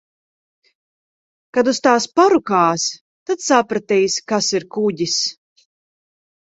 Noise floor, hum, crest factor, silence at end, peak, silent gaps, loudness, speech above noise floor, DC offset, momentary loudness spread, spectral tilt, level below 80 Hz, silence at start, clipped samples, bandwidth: under -90 dBFS; none; 20 dB; 1.2 s; 0 dBFS; 3.01-3.26 s; -17 LUFS; over 73 dB; under 0.1%; 9 LU; -3 dB/octave; -64 dBFS; 1.55 s; under 0.1%; 8.2 kHz